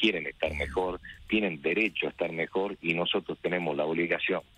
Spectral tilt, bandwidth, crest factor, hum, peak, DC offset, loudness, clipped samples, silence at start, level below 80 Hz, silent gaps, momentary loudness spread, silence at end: -6 dB/octave; 11.5 kHz; 20 dB; none; -10 dBFS; under 0.1%; -29 LUFS; under 0.1%; 0 s; -52 dBFS; none; 5 LU; 0.15 s